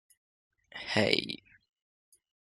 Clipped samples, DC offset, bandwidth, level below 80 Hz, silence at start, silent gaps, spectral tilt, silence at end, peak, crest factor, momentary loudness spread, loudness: under 0.1%; under 0.1%; 12.5 kHz; -70 dBFS; 0.75 s; none; -4.5 dB/octave; 1.2 s; -6 dBFS; 30 dB; 17 LU; -30 LUFS